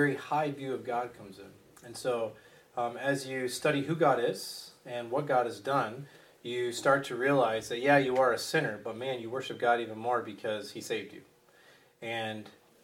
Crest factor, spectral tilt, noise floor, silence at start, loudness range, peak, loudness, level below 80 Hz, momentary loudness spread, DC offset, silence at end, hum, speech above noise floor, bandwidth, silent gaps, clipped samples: 22 dB; -4.5 dB/octave; -61 dBFS; 0 s; 6 LU; -10 dBFS; -31 LUFS; -74 dBFS; 15 LU; under 0.1%; 0.35 s; none; 30 dB; 17 kHz; none; under 0.1%